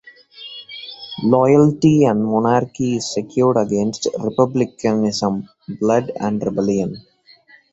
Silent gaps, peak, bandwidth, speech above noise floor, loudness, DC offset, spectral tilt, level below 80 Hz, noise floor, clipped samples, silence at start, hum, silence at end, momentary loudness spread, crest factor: none; -2 dBFS; 8.2 kHz; 33 dB; -18 LUFS; under 0.1%; -6.5 dB/octave; -54 dBFS; -50 dBFS; under 0.1%; 0.05 s; none; 0.7 s; 18 LU; 16 dB